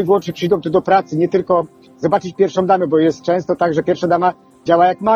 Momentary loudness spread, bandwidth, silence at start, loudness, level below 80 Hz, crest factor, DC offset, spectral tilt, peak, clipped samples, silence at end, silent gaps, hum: 5 LU; 7.2 kHz; 0 s; -16 LUFS; -54 dBFS; 14 dB; under 0.1%; -7 dB/octave; -2 dBFS; under 0.1%; 0 s; none; none